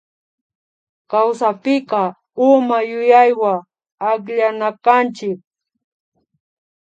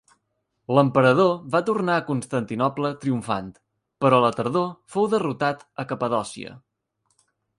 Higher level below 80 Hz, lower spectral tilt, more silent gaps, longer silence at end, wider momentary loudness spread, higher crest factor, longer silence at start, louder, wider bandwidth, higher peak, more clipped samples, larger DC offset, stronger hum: second, -76 dBFS vs -64 dBFS; about the same, -6 dB/octave vs -6.5 dB/octave; first, 3.92-3.98 s vs none; first, 1.6 s vs 1 s; about the same, 12 LU vs 14 LU; about the same, 18 dB vs 20 dB; first, 1.1 s vs 0.7 s; first, -16 LUFS vs -23 LUFS; second, 8.8 kHz vs 11.5 kHz; first, 0 dBFS vs -4 dBFS; neither; neither; neither